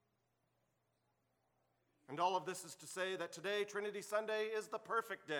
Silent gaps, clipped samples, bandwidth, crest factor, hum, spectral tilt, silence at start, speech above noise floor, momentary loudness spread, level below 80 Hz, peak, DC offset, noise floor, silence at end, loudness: none; under 0.1%; 19.5 kHz; 20 dB; 60 Hz at -90 dBFS; -3 dB/octave; 2.1 s; 41 dB; 9 LU; under -90 dBFS; -24 dBFS; under 0.1%; -83 dBFS; 0 s; -42 LUFS